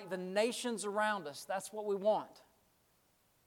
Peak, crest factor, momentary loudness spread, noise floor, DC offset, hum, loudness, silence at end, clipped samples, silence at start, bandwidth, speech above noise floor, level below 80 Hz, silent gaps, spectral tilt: -18 dBFS; 20 dB; 7 LU; -73 dBFS; under 0.1%; none; -36 LUFS; 1.1 s; under 0.1%; 0 s; 18 kHz; 37 dB; -86 dBFS; none; -3.5 dB/octave